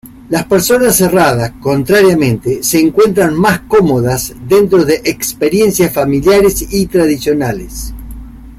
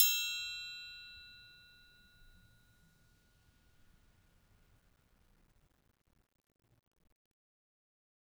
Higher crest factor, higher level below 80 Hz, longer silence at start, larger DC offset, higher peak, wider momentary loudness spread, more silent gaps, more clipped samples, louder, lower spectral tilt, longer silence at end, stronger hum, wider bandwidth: second, 10 dB vs 34 dB; first, -32 dBFS vs -72 dBFS; about the same, 0.05 s vs 0 s; neither; first, 0 dBFS vs -10 dBFS; second, 9 LU vs 25 LU; neither; neither; first, -11 LUFS vs -36 LUFS; first, -5 dB/octave vs 3 dB/octave; second, 0.05 s vs 6.15 s; neither; second, 16.5 kHz vs over 20 kHz